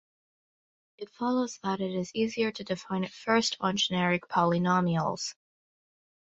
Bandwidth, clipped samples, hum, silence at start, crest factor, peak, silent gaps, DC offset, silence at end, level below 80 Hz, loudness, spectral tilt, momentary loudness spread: 8 kHz; under 0.1%; none; 1 s; 20 dB; -10 dBFS; none; under 0.1%; 0.95 s; -68 dBFS; -29 LUFS; -5 dB/octave; 9 LU